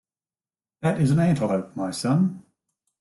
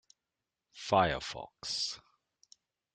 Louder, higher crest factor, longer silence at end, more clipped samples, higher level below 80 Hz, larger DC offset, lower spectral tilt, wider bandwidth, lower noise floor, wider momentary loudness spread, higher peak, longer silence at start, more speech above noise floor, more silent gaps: first, -23 LUFS vs -33 LUFS; second, 14 dB vs 24 dB; second, 0.6 s vs 0.95 s; neither; about the same, -58 dBFS vs -62 dBFS; neither; first, -7 dB/octave vs -3.5 dB/octave; first, 12 kHz vs 9.4 kHz; about the same, under -90 dBFS vs -89 dBFS; second, 8 LU vs 15 LU; first, -10 dBFS vs -14 dBFS; about the same, 0.8 s vs 0.75 s; first, over 68 dB vs 57 dB; neither